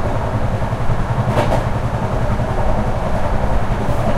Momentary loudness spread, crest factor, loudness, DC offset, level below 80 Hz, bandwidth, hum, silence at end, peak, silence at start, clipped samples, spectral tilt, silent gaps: 3 LU; 14 dB; -19 LUFS; under 0.1%; -22 dBFS; 12 kHz; none; 0 s; -2 dBFS; 0 s; under 0.1%; -7.5 dB/octave; none